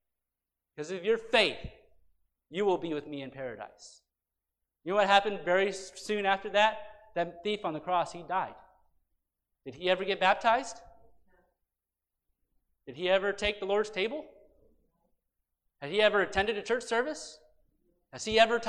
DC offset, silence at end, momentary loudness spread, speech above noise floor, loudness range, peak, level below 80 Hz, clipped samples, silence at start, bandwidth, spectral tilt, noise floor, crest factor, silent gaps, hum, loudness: under 0.1%; 0 s; 19 LU; 59 dB; 5 LU; -10 dBFS; -62 dBFS; under 0.1%; 0.8 s; 11.5 kHz; -3.5 dB/octave; -89 dBFS; 22 dB; none; none; -29 LUFS